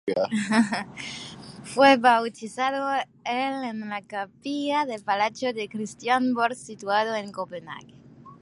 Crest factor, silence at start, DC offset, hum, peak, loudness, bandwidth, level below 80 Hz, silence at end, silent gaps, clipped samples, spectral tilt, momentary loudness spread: 20 dB; 0.05 s; under 0.1%; none; -4 dBFS; -25 LUFS; 11.5 kHz; -68 dBFS; 0.05 s; none; under 0.1%; -4 dB/octave; 16 LU